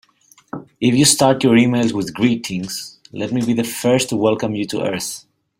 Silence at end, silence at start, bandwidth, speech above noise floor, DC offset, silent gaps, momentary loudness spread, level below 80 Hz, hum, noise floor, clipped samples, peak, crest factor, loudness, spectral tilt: 0.4 s; 0.55 s; 16 kHz; 37 dB; under 0.1%; none; 16 LU; -54 dBFS; none; -53 dBFS; under 0.1%; 0 dBFS; 18 dB; -17 LUFS; -4.5 dB/octave